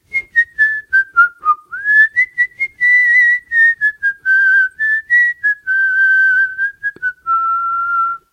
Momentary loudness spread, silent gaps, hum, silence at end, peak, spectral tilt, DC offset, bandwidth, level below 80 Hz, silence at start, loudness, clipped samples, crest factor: 8 LU; none; none; 0.15 s; -2 dBFS; -0.5 dB/octave; under 0.1%; 10.5 kHz; -58 dBFS; 0.15 s; -12 LUFS; under 0.1%; 12 dB